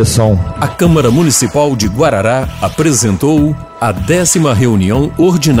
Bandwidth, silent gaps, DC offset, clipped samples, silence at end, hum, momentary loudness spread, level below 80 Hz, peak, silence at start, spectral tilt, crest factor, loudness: 16.5 kHz; none; under 0.1%; under 0.1%; 0 s; none; 6 LU; -30 dBFS; 0 dBFS; 0 s; -5 dB/octave; 10 dB; -11 LUFS